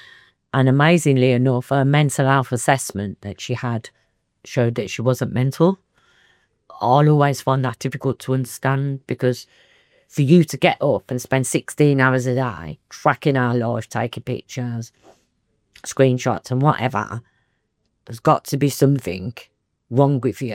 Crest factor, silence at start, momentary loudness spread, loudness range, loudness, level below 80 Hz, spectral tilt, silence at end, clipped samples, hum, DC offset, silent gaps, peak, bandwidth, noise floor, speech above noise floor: 18 dB; 0.55 s; 14 LU; 5 LU; -19 LUFS; -60 dBFS; -6 dB/octave; 0 s; under 0.1%; none; under 0.1%; none; -2 dBFS; 16 kHz; -70 dBFS; 52 dB